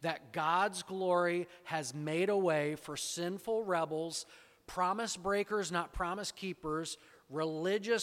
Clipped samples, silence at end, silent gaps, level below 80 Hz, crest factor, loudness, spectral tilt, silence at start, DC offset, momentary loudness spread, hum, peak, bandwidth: under 0.1%; 0 s; none; -60 dBFS; 16 dB; -35 LUFS; -4 dB/octave; 0 s; under 0.1%; 9 LU; none; -18 dBFS; 16.5 kHz